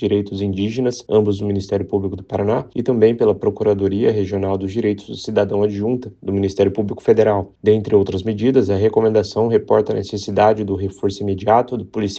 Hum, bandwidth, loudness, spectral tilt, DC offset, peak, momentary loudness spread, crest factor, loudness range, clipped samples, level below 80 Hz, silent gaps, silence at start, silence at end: none; 7.8 kHz; -18 LUFS; -7.5 dB/octave; under 0.1%; 0 dBFS; 7 LU; 16 dB; 3 LU; under 0.1%; -50 dBFS; none; 0 s; 0 s